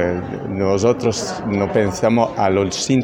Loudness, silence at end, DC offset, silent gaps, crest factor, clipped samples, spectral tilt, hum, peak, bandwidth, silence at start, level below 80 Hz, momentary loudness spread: -18 LUFS; 0 s; under 0.1%; none; 16 dB; under 0.1%; -5.5 dB/octave; none; -2 dBFS; 16.5 kHz; 0 s; -48 dBFS; 6 LU